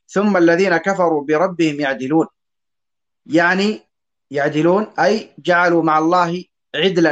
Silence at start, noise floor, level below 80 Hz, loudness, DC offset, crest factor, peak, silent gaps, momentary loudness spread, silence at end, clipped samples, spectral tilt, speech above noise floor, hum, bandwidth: 0.1 s; -87 dBFS; -64 dBFS; -16 LUFS; under 0.1%; 14 dB; -2 dBFS; none; 8 LU; 0 s; under 0.1%; -5.5 dB/octave; 71 dB; none; 8.2 kHz